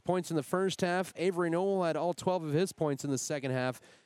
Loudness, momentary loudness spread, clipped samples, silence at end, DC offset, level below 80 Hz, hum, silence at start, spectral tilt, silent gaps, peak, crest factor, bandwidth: -32 LUFS; 3 LU; under 0.1%; 0.25 s; under 0.1%; -74 dBFS; none; 0.05 s; -5.5 dB/octave; none; -14 dBFS; 18 dB; 16 kHz